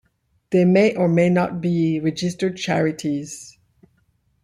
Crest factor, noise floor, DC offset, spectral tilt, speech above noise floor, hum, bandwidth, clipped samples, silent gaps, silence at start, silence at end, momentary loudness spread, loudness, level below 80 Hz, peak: 16 dB; -64 dBFS; under 0.1%; -6.5 dB/octave; 45 dB; none; 11.5 kHz; under 0.1%; none; 0.5 s; 0.95 s; 10 LU; -20 LUFS; -58 dBFS; -4 dBFS